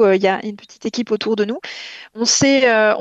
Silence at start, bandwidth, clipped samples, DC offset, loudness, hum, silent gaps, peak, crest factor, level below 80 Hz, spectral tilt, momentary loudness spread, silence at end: 0 s; 8.6 kHz; under 0.1%; under 0.1%; -17 LUFS; none; none; -2 dBFS; 14 dB; -62 dBFS; -3 dB/octave; 17 LU; 0 s